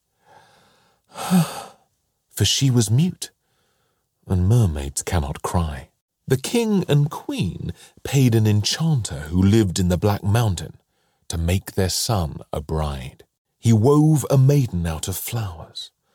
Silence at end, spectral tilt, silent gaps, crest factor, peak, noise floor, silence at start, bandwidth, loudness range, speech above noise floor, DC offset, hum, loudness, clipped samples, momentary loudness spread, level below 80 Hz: 0.3 s; -5.5 dB/octave; 6.01-6.08 s, 13.38-13.45 s; 16 dB; -6 dBFS; -69 dBFS; 1.15 s; 18 kHz; 4 LU; 49 dB; under 0.1%; none; -21 LUFS; under 0.1%; 17 LU; -38 dBFS